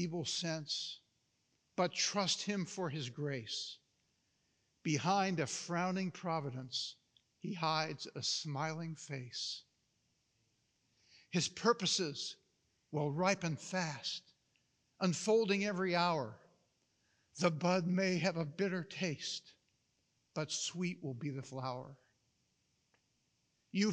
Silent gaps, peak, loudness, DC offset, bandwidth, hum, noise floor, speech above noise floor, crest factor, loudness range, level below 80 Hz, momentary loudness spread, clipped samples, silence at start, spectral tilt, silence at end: none; -18 dBFS; -37 LUFS; under 0.1%; 10 kHz; none; -80 dBFS; 42 dB; 22 dB; 7 LU; -88 dBFS; 12 LU; under 0.1%; 0 s; -4 dB/octave; 0 s